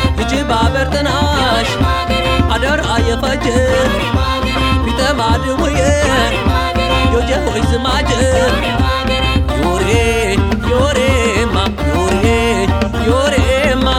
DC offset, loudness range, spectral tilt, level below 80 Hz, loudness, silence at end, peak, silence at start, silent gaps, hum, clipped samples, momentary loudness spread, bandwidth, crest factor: 0.4%; 1 LU; -5 dB/octave; -20 dBFS; -14 LUFS; 0 s; -2 dBFS; 0 s; none; none; under 0.1%; 3 LU; 16 kHz; 12 dB